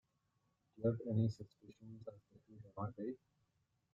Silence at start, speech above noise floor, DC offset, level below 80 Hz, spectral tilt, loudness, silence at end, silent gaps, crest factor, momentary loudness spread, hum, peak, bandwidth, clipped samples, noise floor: 0.8 s; 40 dB; under 0.1%; -76 dBFS; -10.5 dB/octave; -42 LUFS; 0.75 s; none; 20 dB; 20 LU; none; -24 dBFS; 7.4 kHz; under 0.1%; -82 dBFS